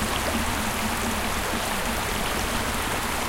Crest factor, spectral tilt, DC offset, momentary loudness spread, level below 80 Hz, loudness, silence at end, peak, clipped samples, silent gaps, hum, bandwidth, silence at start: 14 dB; -3 dB/octave; under 0.1%; 1 LU; -36 dBFS; -26 LUFS; 0 s; -12 dBFS; under 0.1%; none; none; 17 kHz; 0 s